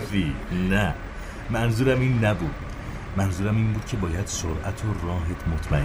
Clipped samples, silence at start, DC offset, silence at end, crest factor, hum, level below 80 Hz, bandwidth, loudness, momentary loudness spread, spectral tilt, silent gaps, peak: under 0.1%; 0 s; under 0.1%; 0 s; 14 dB; none; -34 dBFS; over 20 kHz; -26 LUFS; 12 LU; -6 dB/octave; none; -10 dBFS